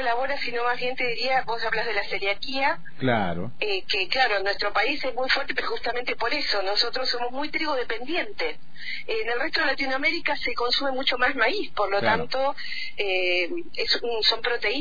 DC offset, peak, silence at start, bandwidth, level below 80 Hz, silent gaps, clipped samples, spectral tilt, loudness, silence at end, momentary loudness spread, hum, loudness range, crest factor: 4%; -6 dBFS; 0 s; 5 kHz; -52 dBFS; none; under 0.1%; -4 dB/octave; -25 LUFS; 0 s; 7 LU; none; 2 LU; 18 dB